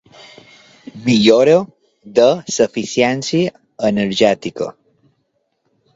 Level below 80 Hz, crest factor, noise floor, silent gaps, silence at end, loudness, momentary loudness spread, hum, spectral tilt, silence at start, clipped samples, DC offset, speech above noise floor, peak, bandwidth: -56 dBFS; 16 dB; -67 dBFS; none; 1.25 s; -15 LUFS; 12 LU; none; -5 dB/octave; 0.95 s; under 0.1%; under 0.1%; 53 dB; 0 dBFS; 8 kHz